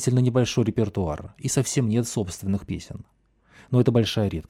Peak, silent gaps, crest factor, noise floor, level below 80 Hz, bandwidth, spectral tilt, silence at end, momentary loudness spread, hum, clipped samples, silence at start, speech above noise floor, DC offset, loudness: -8 dBFS; none; 16 dB; -55 dBFS; -48 dBFS; 15 kHz; -6 dB/octave; 0.05 s; 12 LU; none; under 0.1%; 0 s; 31 dB; under 0.1%; -24 LUFS